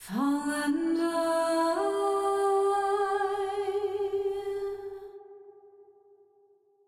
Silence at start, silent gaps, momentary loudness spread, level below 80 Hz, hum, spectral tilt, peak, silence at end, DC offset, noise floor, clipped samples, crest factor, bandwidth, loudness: 0 s; none; 10 LU; -68 dBFS; none; -4 dB/octave; -16 dBFS; 1.05 s; under 0.1%; -64 dBFS; under 0.1%; 12 dB; 14.5 kHz; -29 LUFS